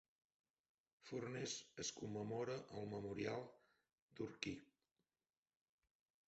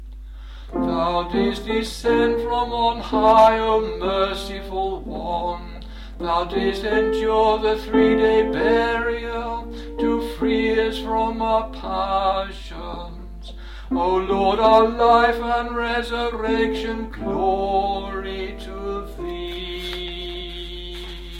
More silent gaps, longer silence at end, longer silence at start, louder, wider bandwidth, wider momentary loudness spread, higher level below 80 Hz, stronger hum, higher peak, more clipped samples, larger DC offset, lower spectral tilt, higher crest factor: first, 4.02-4.08 s vs none; first, 1.65 s vs 0 s; first, 1.05 s vs 0 s; second, -49 LUFS vs -21 LUFS; second, 8 kHz vs 15 kHz; second, 9 LU vs 17 LU; second, -80 dBFS vs -36 dBFS; neither; second, -26 dBFS vs -2 dBFS; neither; neither; about the same, -4.5 dB/octave vs -5.5 dB/octave; first, 26 dB vs 18 dB